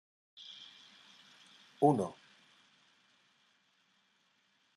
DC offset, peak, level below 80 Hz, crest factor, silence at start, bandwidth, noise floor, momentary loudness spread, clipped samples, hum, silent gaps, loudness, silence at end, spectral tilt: under 0.1%; -14 dBFS; -84 dBFS; 26 dB; 0.5 s; 12 kHz; -74 dBFS; 28 LU; under 0.1%; none; none; -32 LUFS; 2.65 s; -7 dB/octave